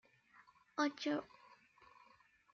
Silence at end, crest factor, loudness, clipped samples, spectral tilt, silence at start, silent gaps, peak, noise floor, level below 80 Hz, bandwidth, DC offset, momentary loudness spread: 1.3 s; 24 dB; -41 LUFS; under 0.1%; -2 dB/octave; 0.75 s; none; -22 dBFS; -70 dBFS; -88 dBFS; 7.2 kHz; under 0.1%; 26 LU